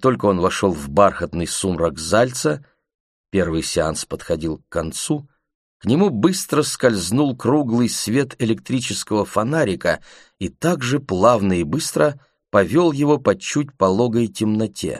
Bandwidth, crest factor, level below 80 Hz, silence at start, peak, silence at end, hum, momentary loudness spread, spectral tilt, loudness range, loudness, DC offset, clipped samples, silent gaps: 15 kHz; 18 dB; -46 dBFS; 0 s; 0 dBFS; 0 s; none; 8 LU; -5 dB/octave; 4 LU; -19 LUFS; under 0.1%; under 0.1%; 2.94-3.24 s, 5.55-5.80 s